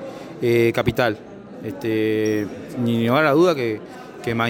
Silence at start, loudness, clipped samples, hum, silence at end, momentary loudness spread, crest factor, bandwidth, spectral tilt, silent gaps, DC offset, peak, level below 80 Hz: 0 s; -20 LUFS; under 0.1%; none; 0 s; 16 LU; 16 dB; 17 kHz; -6.5 dB/octave; none; under 0.1%; -4 dBFS; -50 dBFS